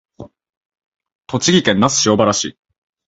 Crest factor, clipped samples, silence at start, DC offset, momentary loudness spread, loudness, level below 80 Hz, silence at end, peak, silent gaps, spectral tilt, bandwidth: 18 dB; under 0.1%; 0.2 s; under 0.1%; 10 LU; -15 LUFS; -50 dBFS; 0.6 s; 0 dBFS; 0.57-0.70 s, 0.86-0.92 s, 1.15-1.19 s; -3.5 dB/octave; 8 kHz